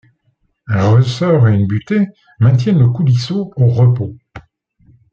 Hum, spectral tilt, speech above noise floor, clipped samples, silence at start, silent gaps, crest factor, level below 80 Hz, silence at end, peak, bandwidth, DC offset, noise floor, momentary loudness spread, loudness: none; -8.5 dB/octave; 49 dB; under 0.1%; 0.7 s; none; 12 dB; -50 dBFS; 0.7 s; -2 dBFS; 7.2 kHz; under 0.1%; -62 dBFS; 9 LU; -14 LUFS